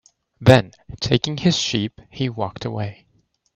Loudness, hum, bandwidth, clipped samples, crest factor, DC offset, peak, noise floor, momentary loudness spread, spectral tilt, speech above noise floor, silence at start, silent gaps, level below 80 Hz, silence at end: -20 LUFS; none; 11 kHz; under 0.1%; 20 dB; under 0.1%; 0 dBFS; -64 dBFS; 15 LU; -5.5 dB/octave; 44 dB; 0.4 s; none; -48 dBFS; 0.65 s